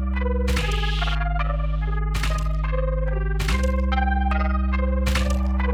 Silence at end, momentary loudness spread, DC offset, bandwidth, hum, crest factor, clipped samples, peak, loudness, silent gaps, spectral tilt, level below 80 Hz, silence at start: 0 s; 3 LU; under 0.1%; 13.5 kHz; none; 12 dB; under 0.1%; -10 dBFS; -24 LUFS; none; -6 dB/octave; -22 dBFS; 0 s